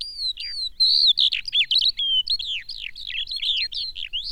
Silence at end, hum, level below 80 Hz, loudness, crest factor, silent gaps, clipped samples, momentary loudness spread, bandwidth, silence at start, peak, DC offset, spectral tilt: 0 s; none; -50 dBFS; -20 LUFS; 14 dB; none; under 0.1%; 13 LU; 16.5 kHz; 0 s; -8 dBFS; 0.3%; 2.5 dB/octave